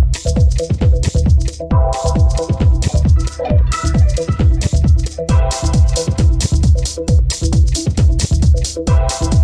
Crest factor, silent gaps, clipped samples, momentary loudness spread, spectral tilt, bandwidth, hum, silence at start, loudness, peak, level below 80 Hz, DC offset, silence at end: 10 dB; none; under 0.1%; 2 LU; -6 dB/octave; 11 kHz; none; 0 s; -15 LUFS; -2 dBFS; -14 dBFS; under 0.1%; 0 s